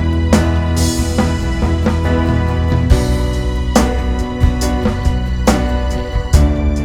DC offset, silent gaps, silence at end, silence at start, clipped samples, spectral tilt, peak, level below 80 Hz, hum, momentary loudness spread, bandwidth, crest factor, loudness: under 0.1%; none; 0 s; 0 s; under 0.1%; -6 dB/octave; 0 dBFS; -18 dBFS; none; 5 LU; 15.5 kHz; 14 dB; -15 LUFS